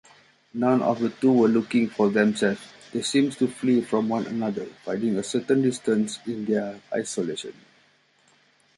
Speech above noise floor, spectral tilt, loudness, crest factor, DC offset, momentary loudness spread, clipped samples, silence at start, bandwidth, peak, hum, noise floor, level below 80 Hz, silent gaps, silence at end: 38 dB; -5.5 dB/octave; -24 LUFS; 18 dB; under 0.1%; 10 LU; under 0.1%; 0.55 s; 11.5 kHz; -6 dBFS; none; -62 dBFS; -68 dBFS; none; 1.25 s